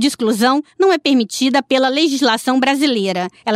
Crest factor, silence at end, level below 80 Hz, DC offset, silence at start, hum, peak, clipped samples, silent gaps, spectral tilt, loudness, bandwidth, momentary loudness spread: 12 dB; 0 s; -66 dBFS; under 0.1%; 0 s; none; -4 dBFS; under 0.1%; none; -3.5 dB/octave; -15 LUFS; 16 kHz; 2 LU